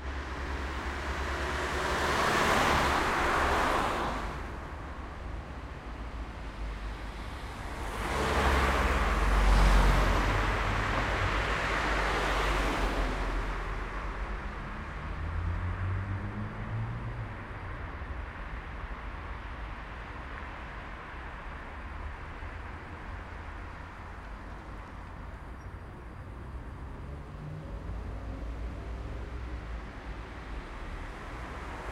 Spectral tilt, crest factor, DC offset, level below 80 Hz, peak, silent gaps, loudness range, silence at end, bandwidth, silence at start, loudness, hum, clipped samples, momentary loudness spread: -5 dB/octave; 22 dB; under 0.1%; -36 dBFS; -12 dBFS; none; 15 LU; 0 s; 15.5 kHz; 0 s; -33 LUFS; none; under 0.1%; 16 LU